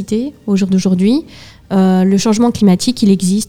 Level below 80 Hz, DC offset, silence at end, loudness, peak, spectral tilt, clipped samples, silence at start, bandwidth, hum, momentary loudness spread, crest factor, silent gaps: -44 dBFS; under 0.1%; 0.05 s; -13 LUFS; 0 dBFS; -6 dB/octave; under 0.1%; 0 s; 13.5 kHz; none; 7 LU; 12 dB; none